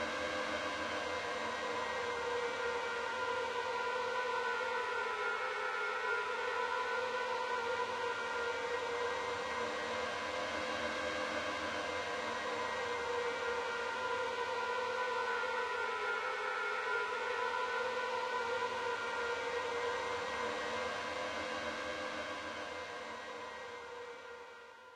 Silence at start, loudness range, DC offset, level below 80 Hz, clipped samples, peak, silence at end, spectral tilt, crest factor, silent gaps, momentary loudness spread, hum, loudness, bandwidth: 0 s; 3 LU; under 0.1%; -72 dBFS; under 0.1%; -24 dBFS; 0 s; -2 dB/octave; 14 dB; none; 5 LU; none; -37 LUFS; 13 kHz